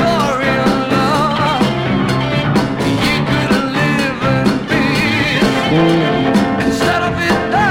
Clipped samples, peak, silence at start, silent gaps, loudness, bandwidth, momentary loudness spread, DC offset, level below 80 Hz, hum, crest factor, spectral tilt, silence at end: under 0.1%; 0 dBFS; 0 s; none; -14 LUFS; 16.5 kHz; 2 LU; under 0.1%; -36 dBFS; none; 12 dB; -5.5 dB/octave; 0 s